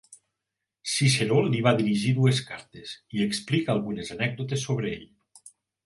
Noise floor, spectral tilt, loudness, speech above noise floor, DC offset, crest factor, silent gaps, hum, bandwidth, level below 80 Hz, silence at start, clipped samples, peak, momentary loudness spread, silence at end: -85 dBFS; -5 dB/octave; -25 LUFS; 60 dB; under 0.1%; 22 dB; none; none; 11.5 kHz; -62 dBFS; 0.1 s; under 0.1%; -6 dBFS; 16 LU; 0.35 s